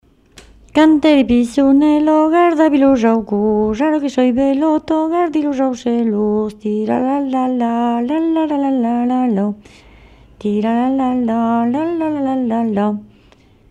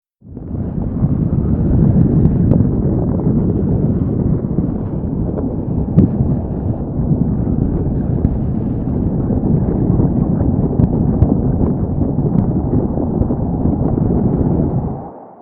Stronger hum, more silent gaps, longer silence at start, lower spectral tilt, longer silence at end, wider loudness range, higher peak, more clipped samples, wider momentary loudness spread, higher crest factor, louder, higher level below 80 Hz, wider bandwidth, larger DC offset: neither; neither; first, 0.75 s vs 0.25 s; second, -7 dB/octave vs -15 dB/octave; first, 0.65 s vs 0 s; about the same, 5 LU vs 3 LU; about the same, -2 dBFS vs 0 dBFS; neither; about the same, 7 LU vs 7 LU; about the same, 12 dB vs 14 dB; about the same, -15 LUFS vs -16 LUFS; second, -46 dBFS vs -24 dBFS; first, 10.5 kHz vs 2.4 kHz; neither